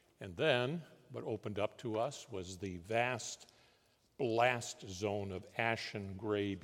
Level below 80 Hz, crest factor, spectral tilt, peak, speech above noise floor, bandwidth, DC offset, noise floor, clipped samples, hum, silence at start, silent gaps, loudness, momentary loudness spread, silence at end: -78 dBFS; 22 dB; -4.5 dB/octave; -16 dBFS; 34 dB; 16.5 kHz; under 0.1%; -72 dBFS; under 0.1%; none; 0.2 s; none; -38 LUFS; 13 LU; 0 s